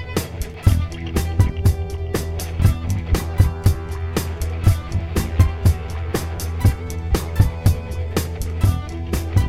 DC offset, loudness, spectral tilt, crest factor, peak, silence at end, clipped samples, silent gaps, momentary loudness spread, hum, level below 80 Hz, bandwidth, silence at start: 0.5%; -21 LUFS; -6.5 dB/octave; 18 dB; 0 dBFS; 0 s; under 0.1%; none; 8 LU; none; -26 dBFS; 16 kHz; 0 s